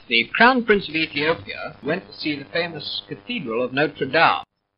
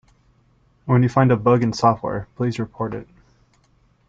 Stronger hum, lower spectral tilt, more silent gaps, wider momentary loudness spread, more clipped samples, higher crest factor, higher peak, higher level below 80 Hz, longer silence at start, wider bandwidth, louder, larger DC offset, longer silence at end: neither; second, -1.5 dB/octave vs -8 dB/octave; neither; about the same, 13 LU vs 12 LU; neither; about the same, 20 dB vs 18 dB; first, 0 dBFS vs -4 dBFS; about the same, -54 dBFS vs -52 dBFS; second, 0.1 s vs 0.85 s; second, 5.6 kHz vs 7.6 kHz; about the same, -21 LUFS vs -20 LUFS; neither; second, 0.35 s vs 1.05 s